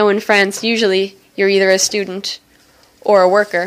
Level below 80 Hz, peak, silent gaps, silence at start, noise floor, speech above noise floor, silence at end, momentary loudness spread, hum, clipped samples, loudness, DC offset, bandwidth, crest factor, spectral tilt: -64 dBFS; 0 dBFS; none; 0 s; -50 dBFS; 36 dB; 0 s; 12 LU; none; under 0.1%; -14 LUFS; under 0.1%; 15.5 kHz; 14 dB; -3 dB/octave